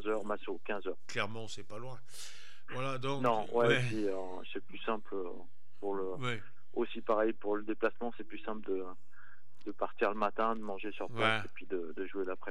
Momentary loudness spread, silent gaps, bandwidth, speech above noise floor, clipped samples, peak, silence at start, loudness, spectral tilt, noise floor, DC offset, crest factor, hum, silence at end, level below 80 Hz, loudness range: 15 LU; none; 13.5 kHz; 25 dB; under 0.1%; -14 dBFS; 0 s; -36 LUFS; -5.5 dB/octave; -62 dBFS; 2%; 24 dB; none; 0 s; -82 dBFS; 3 LU